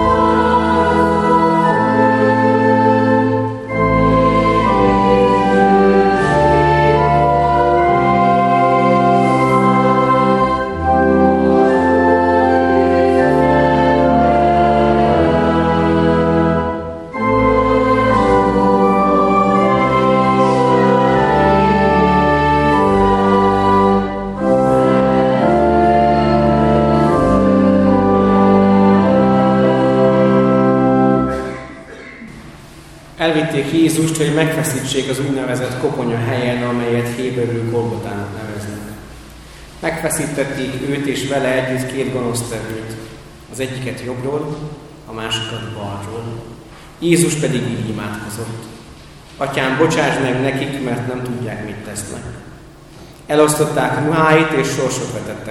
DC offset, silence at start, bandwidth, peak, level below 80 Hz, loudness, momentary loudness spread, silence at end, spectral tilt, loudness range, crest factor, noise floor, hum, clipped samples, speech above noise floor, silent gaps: under 0.1%; 0 s; 13.5 kHz; 0 dBFS; -34 dBFS; -14 LUFS; 13 LU; 0 s; -6 dB/octave; 9 LU; 14 dB; -38 dBFS; none; under 0.1%; 20 dB; none